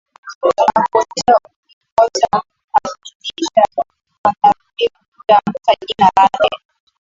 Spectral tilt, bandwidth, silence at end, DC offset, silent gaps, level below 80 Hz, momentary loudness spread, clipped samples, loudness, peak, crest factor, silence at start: -3.5 dB/octave; 7.8 kHz; 0.45 s; under 0.1%; 0.35-0.41 s, 1.56-1.63 s, 1.73-1.81 s, 1.92-1.97 s, 2.64-2.68 s, 3.15-3.20 s, 4.18-4.24 s, 5.08-5.12 s; -52 dBFS; 13 LU; under 0.1%; -15 LUFS; 0 dBFS; 16 dB; 0.25 s